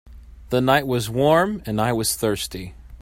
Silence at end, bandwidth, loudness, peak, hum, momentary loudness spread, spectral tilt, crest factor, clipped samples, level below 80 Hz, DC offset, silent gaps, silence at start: 0.05 s; 16.5 kHz; -21 LUFS; -4 dBFS; none; 11 LU; -4.5 dB/octave; 18 dB; under 0.1%; -44 dBFS; under 0.1%; none; 0.05 s